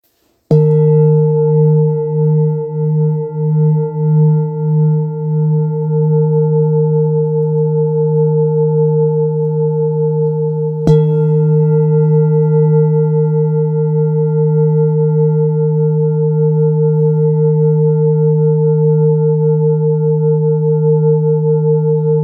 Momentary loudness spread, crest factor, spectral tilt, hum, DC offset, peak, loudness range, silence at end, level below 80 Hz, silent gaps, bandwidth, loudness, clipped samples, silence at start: 4 LU; 12 dB; -13 dB/octave; none; under 0.1%; 0 dBFS; 2 LU; 0 s; -50 dBFS; none; 2.1 kHz; -13 LUFS; under 0.1%; 0.5 s